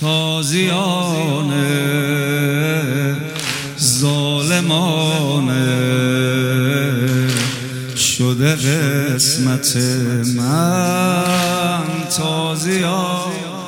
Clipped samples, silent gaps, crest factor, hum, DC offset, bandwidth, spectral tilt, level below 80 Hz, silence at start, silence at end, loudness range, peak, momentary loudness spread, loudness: under 0.1%; none; 16 dB; none; under 0.1%; 17 kHz; -4.5 dB/octave; -56 dBFS; 0 s; 0 s; 2 LU; 0 dBFS; 4 LU; -16 LUFS